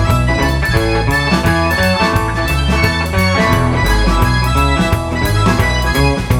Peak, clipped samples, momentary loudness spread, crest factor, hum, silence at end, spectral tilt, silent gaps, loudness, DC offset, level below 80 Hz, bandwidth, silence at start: 0 dBFS; under 0.1%; 2 LU; 12 dB; none; 0 s; -5.5 dB/octave; none; -13 LUFS; under 0.1%; -20 dBFS; 19.5 kHz; 0 s